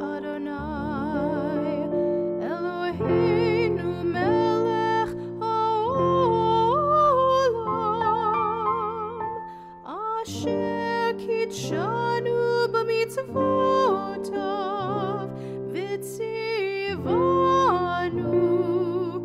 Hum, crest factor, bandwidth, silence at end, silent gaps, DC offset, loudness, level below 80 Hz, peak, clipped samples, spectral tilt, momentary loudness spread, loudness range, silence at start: none; 12 dB; 14 kHz; 0 s; none; under 0.1%; -24 LUFS; -54 dBFS; -12 dBFS; under 0.1%; -6.5 dB/octave; 10 LU; 6 LU; 0 s